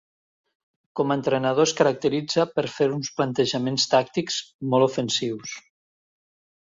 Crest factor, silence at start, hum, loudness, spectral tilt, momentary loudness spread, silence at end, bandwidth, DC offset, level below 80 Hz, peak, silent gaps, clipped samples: 18 dB; 0.95 s; none; -23 LUFS; -4.5 dB/octave; 9 LU; 1.05 s; 7.8 kHz; under 0.1%; -66 dBFS; -6 dBFS; 4.54-4.59 s; under 0.1%